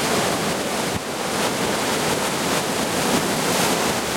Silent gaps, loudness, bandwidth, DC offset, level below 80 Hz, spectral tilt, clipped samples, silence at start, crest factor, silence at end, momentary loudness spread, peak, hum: none; -21 LUFS; 16.5 kHz; under 0.1%; -50 dBFS; -3 dB/octave; under 0.1%; 0 s; 16 dB; 0 s; 4 LU; -6 dBFS; none